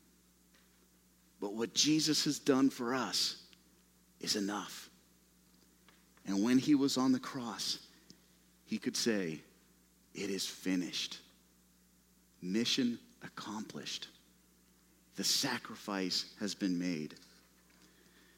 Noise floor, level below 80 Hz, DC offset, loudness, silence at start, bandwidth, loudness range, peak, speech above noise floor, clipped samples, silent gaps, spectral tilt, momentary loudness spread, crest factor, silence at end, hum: -68 dBFS; -76 dBFS; under 0.1%; -35 LUFS; 1.4 s; 16 kHz; 6 LU; -16 dBFS; 33 dB; under 0.1%; none; -3 dB/octave; 18 LU; 22 dB; 1.2 s; 60 Hz at -70 dBFS